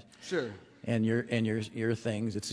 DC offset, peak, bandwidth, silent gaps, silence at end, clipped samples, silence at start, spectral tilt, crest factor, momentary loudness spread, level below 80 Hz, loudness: under 0.1%; -16 dBFS; 11 kHz; none; 0 s; under 0.1%; 0.2 s; -6 dB/octave; 18 dB; 6 LU; -68 dBFS; -32 LUFS